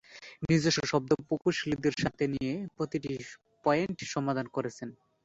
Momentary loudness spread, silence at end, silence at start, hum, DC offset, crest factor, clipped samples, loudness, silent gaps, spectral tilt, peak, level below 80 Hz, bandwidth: 13 LU; 0.3 s; 0.1 s; none; under 0.1%; 20 dB; under 0.1%; -31 LUFS; none; -5.5 dB/octave; -12 dBFS; -60 dBFS; 8 kHz